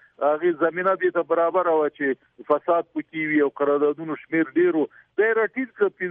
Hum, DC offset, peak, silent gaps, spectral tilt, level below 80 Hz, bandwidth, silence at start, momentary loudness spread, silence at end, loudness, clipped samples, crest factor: none; under 0.1%; -8 dBFS; none; -9.5 dB/octave; -76 dBFS; 3.7 kHz; 0.2 s; 6 LU; 0 s; -23 LUFS; under 0.1%; 16 dB